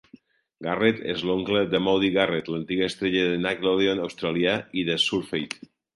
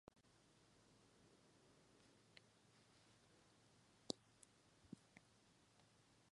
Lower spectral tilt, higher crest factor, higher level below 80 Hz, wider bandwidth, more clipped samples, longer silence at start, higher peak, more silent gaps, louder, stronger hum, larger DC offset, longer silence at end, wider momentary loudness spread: first, -5 dB/octave vs -3.5 dB/octave; second, 20 dB vs 42 dB; first, -58 dBFS vs -88 dBFS; about the same, 11.5 kHz vs 11 kHz; neither; first, 0.6 s vs 0.1 s; first, -6 dBFS vs -24 dBFS; neither; first, -24 LUFS vs -56 LUFS; neither; neither; first, 0.4 s vs 0 s; second, 8 LU vs 16 LU